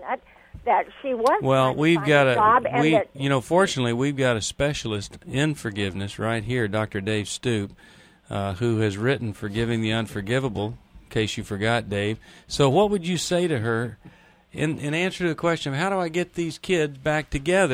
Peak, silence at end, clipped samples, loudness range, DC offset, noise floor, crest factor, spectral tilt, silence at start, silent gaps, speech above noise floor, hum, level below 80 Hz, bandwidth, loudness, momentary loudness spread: -6 dBFS; 0 s; under 0.1%; 6 LU; under 0.1%; -46 dBFS; 18 dB; -5.5 dB/octave; 0 s; none; 22 dB; none; -50 dBFS; 16 kHz; -24 LUFS; 11 LU